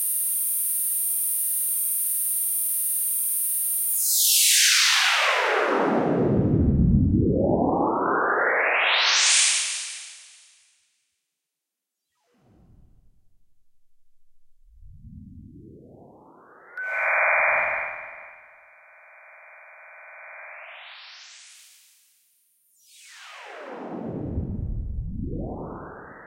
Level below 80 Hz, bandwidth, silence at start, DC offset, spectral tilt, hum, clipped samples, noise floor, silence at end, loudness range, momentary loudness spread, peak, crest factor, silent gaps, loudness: -40 dBFS; 16.5 kHz; 0 s; under 0.1%; -2.5 dB/octave; none; under 0.1%; -85 dBFS; 0 s; 25 LU; 24 LU; -6 dBFS; 20 dB; none; -21 LUFS